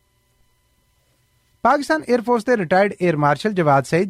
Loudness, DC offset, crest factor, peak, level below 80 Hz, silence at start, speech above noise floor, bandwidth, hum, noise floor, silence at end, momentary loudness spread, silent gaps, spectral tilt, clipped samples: -18 LUFS; under 0.1%; 14 dB; -4 dBFS; -58 dBFS; 1.65 s; 45 dB; 15 kHz; 60 Hz at -45 dBFS; -63 dBFS; 0 s; 3 LU; none; -6.5 dB/octave; under 0.1%